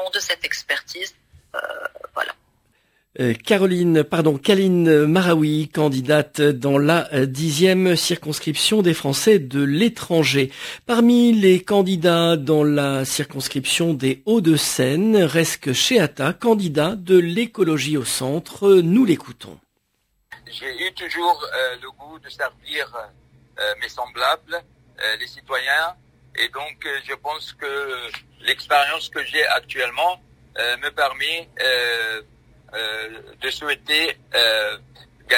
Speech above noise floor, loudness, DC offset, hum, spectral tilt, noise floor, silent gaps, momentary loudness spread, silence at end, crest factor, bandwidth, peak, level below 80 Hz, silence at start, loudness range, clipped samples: 50 dB; -19 LUFS; under 0.1%; none; -4.5 dB/octave; -69 dBFS; none; 13 LU; 0 s; 18 dB; 16 kHz; -2 dBFS; -58 dBFS; 0 s; 8 LU; under 0.1%